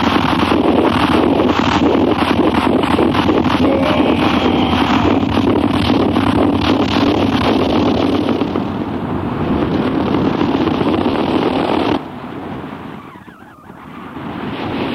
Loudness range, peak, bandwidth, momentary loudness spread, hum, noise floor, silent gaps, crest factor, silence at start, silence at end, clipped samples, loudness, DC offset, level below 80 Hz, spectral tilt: 6 LU; 0 dBFS; 13.5 kHz; 13 LU; none; -38 dBFS; none; 14 dB; 0 s; 0 s; under 0.1%; -15 LUFS; under 0.1%; -34 dBFS; -7 dB/octave